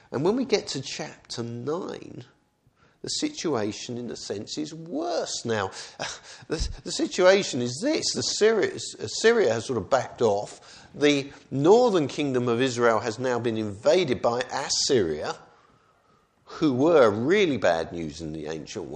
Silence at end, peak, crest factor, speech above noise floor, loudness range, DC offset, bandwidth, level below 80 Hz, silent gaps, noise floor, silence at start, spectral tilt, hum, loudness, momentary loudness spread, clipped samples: 0 s; -4 dBFS; 20 dB; 39 dB; 8 LU; under 0.1%; 10 kHz; -50 dBFS; none; -64 dBFS; 0.1 s; -4 dB/octave; none; -25 LUFS; 15 LU; under 0.1%